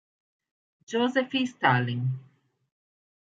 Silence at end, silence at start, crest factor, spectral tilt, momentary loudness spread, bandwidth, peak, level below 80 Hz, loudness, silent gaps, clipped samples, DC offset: 1.1 s; 0.9 s; 22 dB; -6 dB/octave; 9 LU; 7.8 kHz; -6 dBFS; -74 dBFS; -26 LUFS; none; under 0.1%; under 0.1%